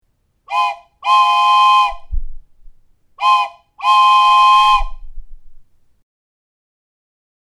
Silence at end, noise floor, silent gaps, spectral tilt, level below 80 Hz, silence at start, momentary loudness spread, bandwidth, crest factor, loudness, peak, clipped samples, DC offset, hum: 1.9 s; -50 dBFS; none; 0 dB/octave; -32 dBFS; 0.5 s; 16 LU; 13 kHz; 14 dB; -12 LUFS; -2 dBFS; under 0.1%; under 0.1%; none